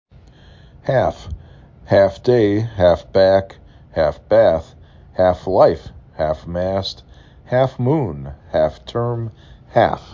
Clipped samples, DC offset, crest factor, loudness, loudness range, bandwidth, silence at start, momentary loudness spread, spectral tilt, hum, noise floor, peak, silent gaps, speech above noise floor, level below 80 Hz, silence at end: under 0.1%; under 0.1%; 18 dB; -18 LUFS; 5 LU; 7.4 kHz; 0.85 s; 16 LU; -7.5 dB/octave; none; -45 dBFS; -2 dBFS; none; 28 dB; -38 dBFS; 0.15 s